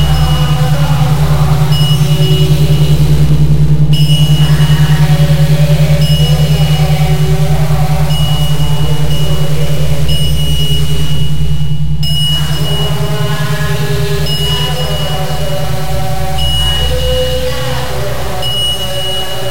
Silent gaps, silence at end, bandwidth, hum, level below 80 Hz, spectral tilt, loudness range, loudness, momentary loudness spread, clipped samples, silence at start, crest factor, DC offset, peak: none; 0 s; 17 kHz; none; -20 dBFS; -5.5 dB/octave; 5 LU; -12 LUFS; 7 LU; under 0.1%; 0 s; 12 dB; 20%; 0 dBFS